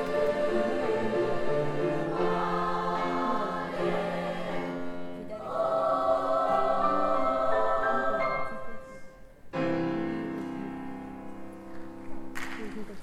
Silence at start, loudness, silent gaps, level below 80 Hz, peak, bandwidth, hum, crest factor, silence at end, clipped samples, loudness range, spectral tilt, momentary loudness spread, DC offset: 0 s; -29 LUFS; none; -52 dBFS; -14 dBFS; 13.5 kHz; none; 16 dB; 0 s; under 0.1%; 8 LU; -6.5 dB/octave; 16 LU; under 0.1%